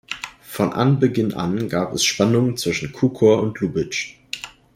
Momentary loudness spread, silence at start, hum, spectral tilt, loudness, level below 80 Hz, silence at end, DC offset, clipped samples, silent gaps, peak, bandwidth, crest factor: 14 LU; 0.1 s; none; -5 dB/octave; -20 LUFS; -54 dBFS; 0.3 s; under 0.1%; under 0.1%; none; -4 dBFS; 16 kHz; 18 dB